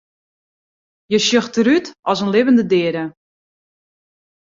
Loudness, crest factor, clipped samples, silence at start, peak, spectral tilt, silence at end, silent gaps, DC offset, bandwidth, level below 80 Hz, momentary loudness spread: -16 LUFS; 16 dB; under 0.1%; 1.1 s; -2 dBFS; -4.5 dB/octave; 1.3 s; 1.99-2.03 s; under 0.1%; 7.8 kHz; -62 dBFS; 8 LU